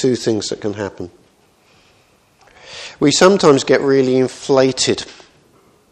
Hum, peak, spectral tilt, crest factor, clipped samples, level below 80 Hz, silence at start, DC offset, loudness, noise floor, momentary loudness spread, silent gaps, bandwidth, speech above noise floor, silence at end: none; 0 dBFS; -4.5 dB/octave; 16 dB; under 0.1%; -56 dBFS; 0 s; under 0.1%; -15 LUFS; -54 dBFS; 22 LU; none; 10 kHz; 40 dB; 0.8 s